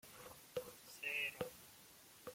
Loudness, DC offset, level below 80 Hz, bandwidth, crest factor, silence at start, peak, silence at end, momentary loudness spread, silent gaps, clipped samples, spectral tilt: -46 LUFS; under 0.1%; -80 dBFS; 16.5 kHz; 24 dB; 0.05 s; -26 dBFS; 0 s; 18 LU; none; under 0.1%; -2.5 dB/octave